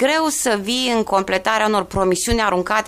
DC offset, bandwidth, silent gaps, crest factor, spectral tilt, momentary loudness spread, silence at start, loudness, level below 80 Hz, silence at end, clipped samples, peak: under 0.1%; 15.5 kHz; none; 14 dB; -3 dB/octave; 2 LU; 0 s; -18 LUFS; -38 dBFS; 0 s; under 0.1%; -4 dBFS